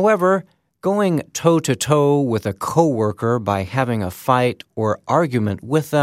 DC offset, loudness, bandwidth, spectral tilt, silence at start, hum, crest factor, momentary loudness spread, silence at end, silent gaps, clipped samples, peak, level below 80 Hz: under 0.1%; -19 LUFS; 16 kHz; -6 dB/octave; 0 s; none; 18 dB; 6 LU; 0 s; none; under 0.1%; 0 dBFS; -56 dBFS